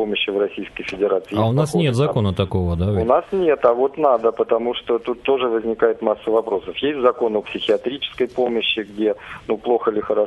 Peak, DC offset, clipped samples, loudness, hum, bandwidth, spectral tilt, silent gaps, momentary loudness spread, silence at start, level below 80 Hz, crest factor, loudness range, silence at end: -2 dBFS; under 0.1%; under 0.1%; -20 LUFS; none; 12 kHz; -6.5 dB/octave; none; 6 LU; 0 s; -40 dBFS; 18 dB; 2 LU; 0 s